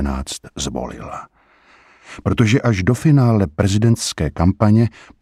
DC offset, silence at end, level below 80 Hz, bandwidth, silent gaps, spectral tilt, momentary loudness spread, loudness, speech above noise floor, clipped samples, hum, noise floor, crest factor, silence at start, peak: under 0.1%; 0.3 s; -34 dBFS; 13.5 kHz; none; -6 dB/octave; 14 LU; -17 LUFS; 35 dB; under 0.1%; none; -51 dBFS; 16 dB; 0 s; -2 dBFS